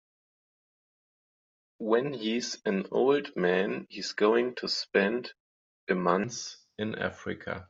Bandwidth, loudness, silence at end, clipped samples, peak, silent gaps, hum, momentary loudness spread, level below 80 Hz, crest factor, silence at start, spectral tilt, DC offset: 7.8 kHz; -29 LUFS; 0.05 s; under 0.1%; -8 dBFS; 5.40-5.87 s; none; 12 LU; -74 dBFS; 22 dB; 1.8 s; -3.5 dB/octave; under 0.1%